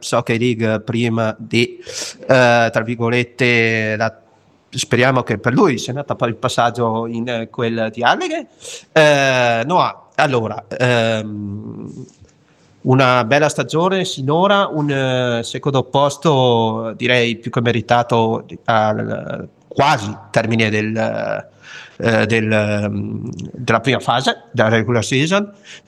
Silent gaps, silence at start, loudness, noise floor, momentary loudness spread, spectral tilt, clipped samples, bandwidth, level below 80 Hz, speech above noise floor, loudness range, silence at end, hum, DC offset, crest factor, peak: none; 0 s; -17 LUFS; -52 dBFS; 12 LU; -5 dB/octave; under 0.1%; 13.5 kHz; -56 dBFS; 35 dB; 3 LU; 0.1 s; none; under 0.1%; 16 dB; 0 dBFS